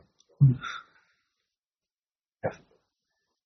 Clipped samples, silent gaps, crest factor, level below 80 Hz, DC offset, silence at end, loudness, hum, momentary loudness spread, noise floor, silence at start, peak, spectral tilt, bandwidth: under 0.1%; none; 22 dB; -60 dBFS; under 0.1%; 0.9 s; -28 LUFS; none; 15 LU; under -90 dBFS; 0.4 s; -10 dBFS; -8 dB/octave; 6.4 kHz